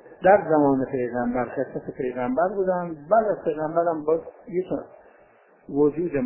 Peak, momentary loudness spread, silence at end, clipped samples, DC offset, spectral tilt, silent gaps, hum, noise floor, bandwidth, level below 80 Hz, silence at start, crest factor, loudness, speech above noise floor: -4 dBFS; 11 LU; 0 s; under 0.1%; under 0.1%; -12 dB/octave; none; none; -56 dBFS; 3.1 kHz; -58 dBFS; 0.05 s; 20 dB; -24 LUFS; 33 dB